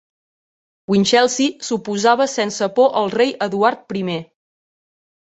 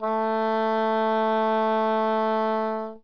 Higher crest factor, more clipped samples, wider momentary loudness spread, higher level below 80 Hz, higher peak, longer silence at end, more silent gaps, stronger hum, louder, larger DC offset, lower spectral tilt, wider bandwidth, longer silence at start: first, 18 dB vs 10 dB; neither; first, 10 LU vs 2 LU; first, -62 dBFS vs -80 dBFS; first, -2 dBFS vs -14 dBFS; first, 1.05 s vs 0.05 s; neither; neither; first, -17 LUFS vs -24 LUFS; second, under 0.1% vs 0.3%; second, -4 dB/octave vs -7 dB/octave; first, 8.2 kHz vs 5.4 kHz; first, 0.9 s vs 0 s